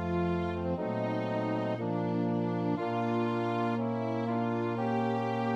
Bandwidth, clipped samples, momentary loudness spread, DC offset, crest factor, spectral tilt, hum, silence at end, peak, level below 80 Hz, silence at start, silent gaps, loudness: 7.8 kHz; under 0.1%; 2 LU; under 0.1%; 12 dB; -8.5 dB/octave; none; 0 s; -18 dBFS; -58 dBFS; 0 s; none; -32 LUFS